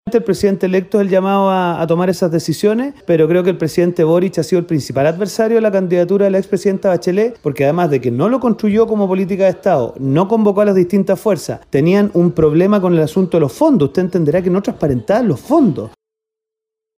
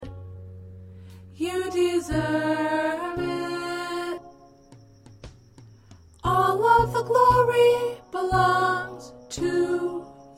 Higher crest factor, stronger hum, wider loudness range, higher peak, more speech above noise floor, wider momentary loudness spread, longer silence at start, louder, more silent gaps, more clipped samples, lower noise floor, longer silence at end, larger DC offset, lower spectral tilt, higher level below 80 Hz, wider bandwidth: second, 12 dB vs 18 dB; neither; second, 1 LU vs 10 LU; first, 0 dBFS vs -8 dBFS; first, 70 dB vs 27 dB; second, 4 LU vs 22 LU; about the same, 0.05 s vs 0 s; first, -14 LUFS vs -23 LUFS; neither; neither; first, -83 dBFS vs -51 dBFS; first, 1.1 s vs 0.1 s; neither; first, -7.5 dB/octave vs -5.5 dB/octave; about the same, -48 dBFS vs -48 dBFS; about the same, 16 kHz vs 16 kHz